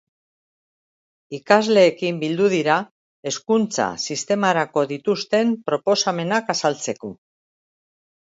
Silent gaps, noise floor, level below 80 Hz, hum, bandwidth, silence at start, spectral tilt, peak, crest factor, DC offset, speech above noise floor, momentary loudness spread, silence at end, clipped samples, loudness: 2.91-3.23 s; under -90 dBFS; -68 dBFS; none; 8 kHz; 1.3 s; -4 dB/octave; 0 dBFS; 22 dB; under 0.1%; over 70 dB; 13 LU; 1.15 s; under 0.1%; -20 LUFS